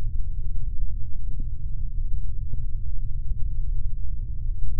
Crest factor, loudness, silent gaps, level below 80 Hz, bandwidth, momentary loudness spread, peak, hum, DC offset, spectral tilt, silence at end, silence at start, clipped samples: 10 dB; -34 LUFS; none; -26 dBFS; 0.5 kHz; 2 LU; -8 dBFS; none; under 0.1%; -16 dB/octave; 0 s; 0 s; under 0.1%